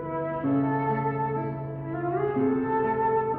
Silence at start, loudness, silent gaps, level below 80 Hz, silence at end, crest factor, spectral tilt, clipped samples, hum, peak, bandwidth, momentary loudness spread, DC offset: 0 s; -27 LUFS; none; -56 dBFS; 0 s; 12 dB; -12.5 dB/octave; under 0.1%; none; -14 dBFS; 3.9 kHz; 7 LU; under 0.1%